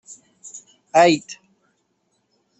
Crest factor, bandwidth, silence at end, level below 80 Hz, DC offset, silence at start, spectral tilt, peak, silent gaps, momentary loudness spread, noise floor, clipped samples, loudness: 20 dB; 8.4 kHz; 1.25 s; -68 dBFS; under 0.1%; 0.1 s; -4 dB/octave; -2 dBFS; none; 25 LU; -69 dBFS; under 0.1%; -17 LUFS